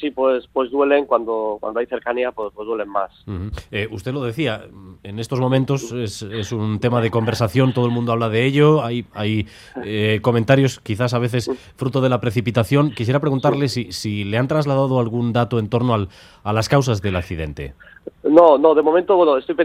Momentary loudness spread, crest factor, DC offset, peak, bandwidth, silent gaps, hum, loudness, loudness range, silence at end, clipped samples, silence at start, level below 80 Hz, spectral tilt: 13 LU; 18 dB; under 0.1%; 0 dBFS; 14.5 kHz; none; none; -19 LUFS; 6 LU; 0 s; under 0.1%; 0 s; -48 dBFS; -7 dB/octave